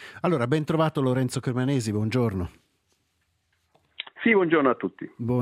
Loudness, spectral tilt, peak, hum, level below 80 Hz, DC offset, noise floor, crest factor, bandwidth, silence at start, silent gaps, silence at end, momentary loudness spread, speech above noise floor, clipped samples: -25 LUFS; -6.5 dB/octave; -8 dBFS; none; -60 dBFS; under 0.1%; -72 dBFS; 18 dB; 15 kHz; 0 s; none; 0 s; 13 LU; 48 dB; under 0.1%